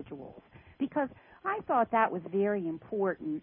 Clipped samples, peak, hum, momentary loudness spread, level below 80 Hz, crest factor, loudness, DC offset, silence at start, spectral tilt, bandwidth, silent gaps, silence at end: under 0.1%; -14 dBFS; none; 12 LU; -68 dBFS; 18 dB; -32 LUFS; under 0.1%; 0 s; -5.5 dB/octave; 3.7 kHz; none; 0 s